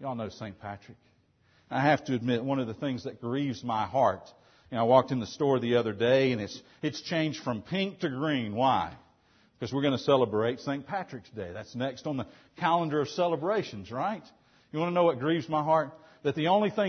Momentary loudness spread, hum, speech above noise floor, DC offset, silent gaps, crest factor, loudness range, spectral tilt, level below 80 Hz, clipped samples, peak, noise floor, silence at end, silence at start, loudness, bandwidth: 14 LU; none; 37 dB; under 0.1%; none; 22 dB; 4 LU; -6.5 dB/octave; -68 dBFS; under 0.1%; -8 dBFS; -66 dBFS; 0 s; 0 s; -29 LUFS; 6.6 kHz